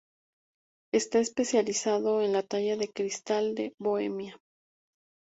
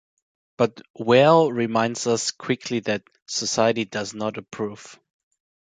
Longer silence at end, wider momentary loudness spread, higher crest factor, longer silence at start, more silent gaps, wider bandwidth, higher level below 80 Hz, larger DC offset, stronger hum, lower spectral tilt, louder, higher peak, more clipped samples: first, 0.95 s vs 0.75 s; second, 6 LU vs 14 LU; about the same, 18 dB vs 20 dB; first, 0.95 s vs 0.6 s; about the same, 3.74-3.78 s vs 0.90-0.94 s, 3.22-3.26 s; second, 8 kHz vs 9.6 kHz; second, -74 dBFS vs -64 dBFS; neither; neither; about the same, -3.5 dB/octave vs -4 dB/octave; second, -29 LUFS vs -22 LUFS; second, -12 dBFS vs -4 dBFS; neither